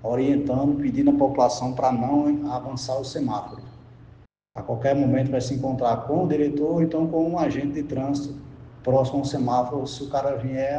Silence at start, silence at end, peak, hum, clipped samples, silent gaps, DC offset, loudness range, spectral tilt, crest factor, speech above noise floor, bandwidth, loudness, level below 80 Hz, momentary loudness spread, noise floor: 0 s; 0 s; -6 dBFS; none; under 0.1%; none; under 0.1%; 4 LU; -7.5 dB/octave; 16 dB; 29 dB; 9 kHz; -24 LUFS; -52 dBFS; 10 LU; -52 dBFS